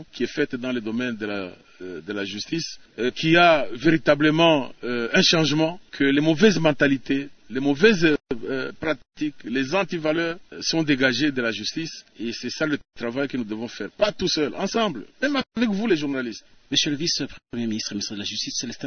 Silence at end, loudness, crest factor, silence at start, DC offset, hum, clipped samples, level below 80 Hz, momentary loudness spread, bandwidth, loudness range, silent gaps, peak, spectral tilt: 0 s; -23 LUFS; 20 dB; 0 s; under 0.1%; none; under 0.1%; -54 dBFS; 13 LU; 6.6 kHz; 7 LU; none; -4 dBFS; -4.5 dB/octave